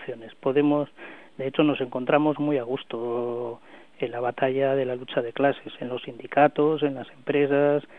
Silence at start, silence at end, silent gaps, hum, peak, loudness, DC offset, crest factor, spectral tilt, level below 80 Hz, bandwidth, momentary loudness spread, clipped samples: 0 s; 0 s; none; none; -6 dBFS; -25 LUFS; 0.2%; 18 dB; -9 dB/octave; -70 dBFS; 4.1 kHz; 13 LU; under 0.1%